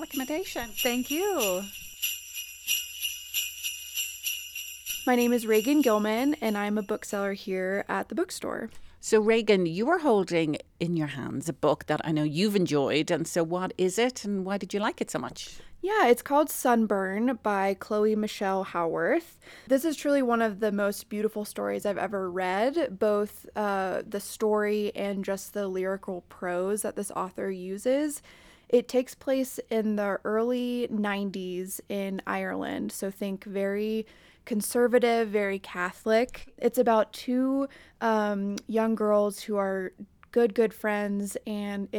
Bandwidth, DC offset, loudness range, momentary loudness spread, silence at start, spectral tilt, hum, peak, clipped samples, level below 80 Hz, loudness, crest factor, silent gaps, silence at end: 19.5 kHz; under 0.1%; 4 LU; 10 LU; 0 s; -4.5 dB/octave; none; -10 dBFS; under 0.1%; -62 dBFS; -28 LUFS; 18 dB; none; 0 s